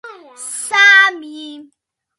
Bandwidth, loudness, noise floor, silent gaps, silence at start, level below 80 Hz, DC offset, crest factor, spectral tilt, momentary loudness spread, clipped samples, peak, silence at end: 11.5 kHz; -9 LUFS; -32 dBFS; none; 0.05 s; -82 dBFS; under 0.1%; 16 dB; 2.5 dB/octave; 24 LU; under 0.1%; 0 dBFS; 0.55 s